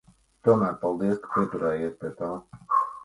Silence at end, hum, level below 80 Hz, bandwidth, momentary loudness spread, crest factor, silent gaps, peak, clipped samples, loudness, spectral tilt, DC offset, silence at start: 0 s; none; -60 dBFS; 11.5 kHz; 11 LU; 20 dB; none; -8 dBFS; under 0.1%; -27 LUFS; -9 dB/octave; under 0.1%; 0.45 s